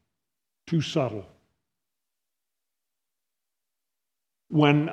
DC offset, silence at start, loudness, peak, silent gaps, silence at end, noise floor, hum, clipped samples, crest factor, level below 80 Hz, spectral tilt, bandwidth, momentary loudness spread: under 0.1%; 0.65 s; -25 LUFS; -6 dBFS; none; 0 s; -87 dBFS; none; under 0.1%; 24 dB; -70 dBFS; -7 dB/octave; 8.4 kHz; 11 LU